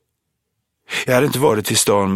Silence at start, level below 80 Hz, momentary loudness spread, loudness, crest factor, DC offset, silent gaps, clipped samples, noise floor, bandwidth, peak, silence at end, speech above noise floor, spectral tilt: 0.9 s; -56 dBFS; 8 LU; -16 LUFS; 18 dB; under 0.1%; none; under 0.1%; -74 dBFS; 16.5 kHz; 0 dBFS; 0 s; 59 dB; -3.5 dB/octave